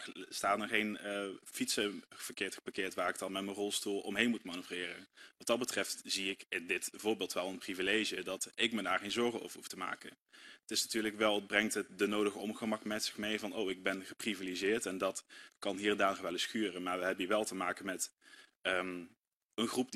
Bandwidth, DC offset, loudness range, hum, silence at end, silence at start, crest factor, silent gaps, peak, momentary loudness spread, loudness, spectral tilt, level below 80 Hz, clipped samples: 14.5 kHz; under 0.1%; 2 LU; none; 0 s; 0 s; 24 dB; 10.21-10.26 s, 18.56-18.61 s, 19.35-19.50 s; -14 dBFS; 10 LU; -37 LUFS; -2.5 dB/octave; -74 dBFS; under 0.1%